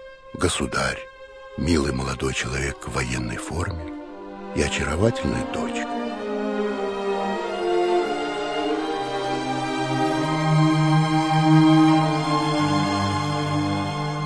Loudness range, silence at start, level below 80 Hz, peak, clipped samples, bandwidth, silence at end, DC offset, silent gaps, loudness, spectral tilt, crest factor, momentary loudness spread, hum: 7 LU; 0 s; -42 dBFS; -4 dBFS; under 0.1%; 11 kHz; 0 s; 0.2%; none; -23 LUFS; -5.5 dB/octave; 18 dB; 10 LU; none